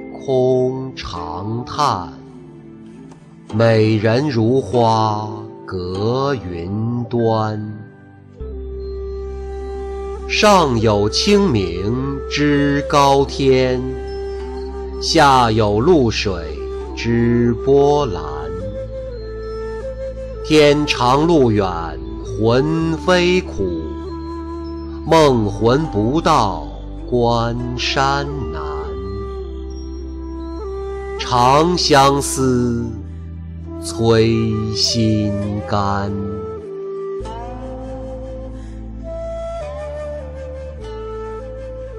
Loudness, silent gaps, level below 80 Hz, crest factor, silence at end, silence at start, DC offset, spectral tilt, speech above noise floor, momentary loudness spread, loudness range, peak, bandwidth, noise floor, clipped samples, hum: -17 LUFS; none; -32 dBFS; 14 dB; 0 s; 0 s; under 0.1%; -5.5 dB/octave; 26 dB; 17 LU; 9 LU; -4 dBFS; 15 kHz; -41 dBFS; under 0.1%; none